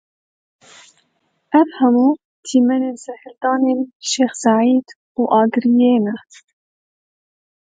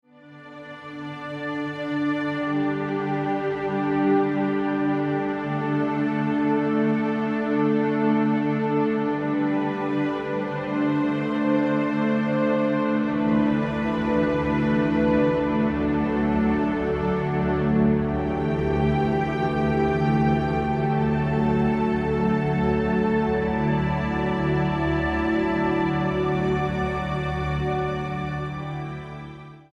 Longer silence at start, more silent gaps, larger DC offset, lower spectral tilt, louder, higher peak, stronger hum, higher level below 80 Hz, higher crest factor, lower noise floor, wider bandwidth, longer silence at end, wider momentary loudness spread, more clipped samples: first, 1.5 s vs 0.25 s; first, 2.25-2.43 s, 3.95-4.00 s, 4.96-5.15 s vs none; neither; second, -4.5 dB/octave vs -8.5 dB/octave; first, -16 LUFS vs -24 LUFS; first, -2 dBFS vs -10 dBFS; neither; second, -72 dBFS vs -40 dBFS; about the same, 16 dB vs 14 dB; first, -66 dBFS vs -45 dBFS; first, 9.2 kHz vs 7.4 kHz; first, 1.55 s vs 0.15 s; first, 11 LU vs 7 LU; neither